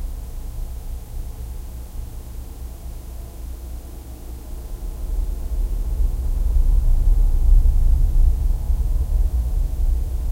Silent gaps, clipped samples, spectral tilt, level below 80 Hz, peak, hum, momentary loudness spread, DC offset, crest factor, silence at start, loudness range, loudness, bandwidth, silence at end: none; under 0.1%; -7 dB/octave; -20 dBFS; -4 dBFS; none; 16 LU; under 0.1%; 16 dB; 0 s; 14 LU; -25 LUFS; 15.5 kHz; 0 s